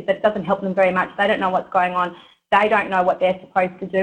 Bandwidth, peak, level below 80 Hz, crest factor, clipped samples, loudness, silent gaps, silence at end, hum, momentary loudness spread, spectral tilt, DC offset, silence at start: 9.2 kHz; -2 dBFS; -58 dBFS; 16 dB; under 0.1%; -19 LUFS; none; 0 s; none; 5 LU; -6.5 dB/octave; under 0.1%; 0 s